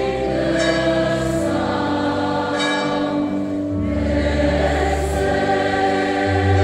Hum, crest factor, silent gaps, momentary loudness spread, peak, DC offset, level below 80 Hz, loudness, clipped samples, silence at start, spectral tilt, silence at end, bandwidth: none; 14 dB; none; 3 LU; -4 dBFS; under 0.1%; -30 dBFS; -19 LUFS; under 0.1%; 0 s; -6 dB/octave; 0 s; 13.5 kHz